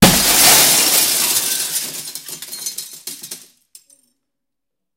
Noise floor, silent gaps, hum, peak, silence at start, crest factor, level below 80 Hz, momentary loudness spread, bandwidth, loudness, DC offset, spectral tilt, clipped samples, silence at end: -83 dBFS; none; none; 0 dBFS; 0 s; 18 dB; -42 dBFS; 22 LU; 17 kHz; -11 LUFS; under 0.1%; -1.5 dB/octave; under 0.1%; 1.6 s